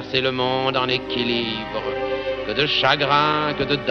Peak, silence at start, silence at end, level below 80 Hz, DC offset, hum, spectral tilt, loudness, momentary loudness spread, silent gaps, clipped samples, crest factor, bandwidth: -4 dBFS; 0 s; 0 s; -48 dBFS; under 0.1%; none; -5.5 dB/octave; -20 LUFS; 8 LU; none; under 0.1%; 18 dB; 6.6 kHz